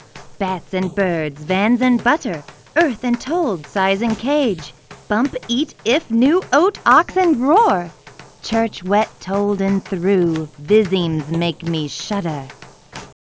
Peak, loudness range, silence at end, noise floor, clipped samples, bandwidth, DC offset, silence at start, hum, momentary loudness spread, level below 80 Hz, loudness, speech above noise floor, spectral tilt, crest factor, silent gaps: 0 dBFS; 4 LU; 0.2 s; -37 dBFS; under 0.1%; 8 kHz; under 0.1%; 0.15 s; none; 11 LU; -50 dBFS; -18 LUFS; 19 dB; -5.5 dB/octave; 18 dB; none